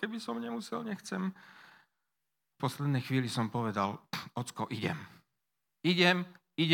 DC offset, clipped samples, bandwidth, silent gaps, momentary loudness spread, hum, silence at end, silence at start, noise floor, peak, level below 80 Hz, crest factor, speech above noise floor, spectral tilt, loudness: under 0.1%; under 0.1%; 17.5 kHz; none; 14 LU; none; 0 s; 0 s; -87 dBFS; -8 dBFS; -80 dBFS; 26 dB; 54 dB; -5.5 dB/octave; -34 LUFS